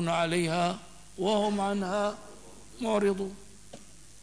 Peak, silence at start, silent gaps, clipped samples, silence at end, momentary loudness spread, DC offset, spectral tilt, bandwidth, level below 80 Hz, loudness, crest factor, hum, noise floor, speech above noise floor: -14 dBFS; 0 s; none; under 0.1%; 0.4 s; 22 LU; 0.3%; -5 dB/octave; 11 kHz; -60 dBFS; -29 LUFS; 16 dB; none; -51 dBFS; 23 dB